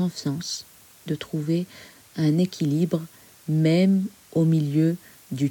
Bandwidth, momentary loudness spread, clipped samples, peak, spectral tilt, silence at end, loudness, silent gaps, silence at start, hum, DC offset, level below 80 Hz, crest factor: 18.5 kHz; 16 LU; under 0.1%; -10 dBFS; -7 dB/octave; 0 s; -24 LUFS; none; 0 s; none; under 0.1%; -66 dBFS; 14 dB